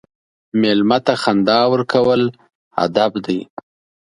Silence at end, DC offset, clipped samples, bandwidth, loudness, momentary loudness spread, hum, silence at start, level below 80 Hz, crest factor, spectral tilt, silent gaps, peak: 0.6 s; under 0.1%; under 0.1%; 11.5 kHz; -16 LUFS; 9 LU; none; 0.55 s; -56 dBFS; 16 dB; -6 dB/octave; 2.55-2.71 s; 0 dBFS